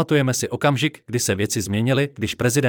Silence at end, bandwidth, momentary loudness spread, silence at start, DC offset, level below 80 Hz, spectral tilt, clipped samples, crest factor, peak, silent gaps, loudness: 0 s; 19 kHz; 4 LU; 0 s; under 0.1%; -56 dBFS; -4.5 dB/octave; under 0.1%; 14 dB; -6 dBFS; none; -21 LUFS